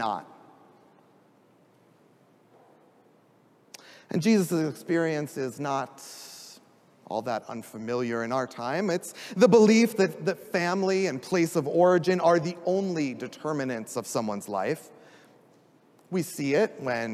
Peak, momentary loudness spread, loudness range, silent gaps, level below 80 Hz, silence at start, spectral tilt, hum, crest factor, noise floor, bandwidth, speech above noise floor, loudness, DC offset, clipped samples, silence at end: -6 dBFS; 15 LU; 9 LU; none; -78 dBFS; 0 s; -5.5 dB/octave; none; 22 dB; -61 dBFS; 15.5 kHz; 35 dB; -26 LUFS; under 0.1%; under 0.1%; 0 s